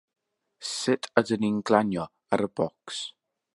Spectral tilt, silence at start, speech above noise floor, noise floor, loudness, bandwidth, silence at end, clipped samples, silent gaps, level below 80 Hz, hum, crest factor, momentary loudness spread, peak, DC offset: -4.5 dB/octave; 0.6 s; 19 dB; -46 dBFS; -27 LUFS; 11.5 kHz; 0.45 s; under 0.1%; none; -66 dBFS; none; 26 dB; 11 LU; -2 dBFS; under 0.1%